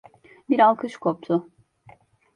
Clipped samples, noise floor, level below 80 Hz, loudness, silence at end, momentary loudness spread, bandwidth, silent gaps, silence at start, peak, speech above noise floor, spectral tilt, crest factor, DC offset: under 0.1%; -54 dBFS; -70 dBFS; -22 LUFS; 0.95 s; 9 LU; 10 kHz; none; 0.5 s; -6 dBFS; 33 dB; -7.5 dB/octave; 20 dB; under 0.1%